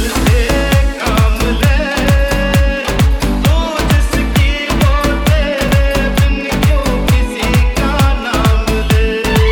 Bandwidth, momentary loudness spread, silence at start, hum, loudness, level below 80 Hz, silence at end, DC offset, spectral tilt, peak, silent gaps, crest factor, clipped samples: 18.5 kHz; 2 LU; 0 s; none; -13 LUFS; -14 dBFS; 0 s; under 0.1%; -5.5 dB/octave; 0 dBFS; none; 12 dB; under 0.1%